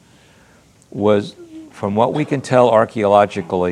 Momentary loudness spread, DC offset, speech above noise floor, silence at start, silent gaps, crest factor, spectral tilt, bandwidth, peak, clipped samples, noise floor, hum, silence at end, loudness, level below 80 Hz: 15 LU; under 0.1%; 35 dB; 0.95 s; none; 18 dB; -6.5 dB/octave; 11 kHz; 0 dBFS; under 0.1%; -50 dBFS; none; 0 s; -16 LUFS; -60 dBFS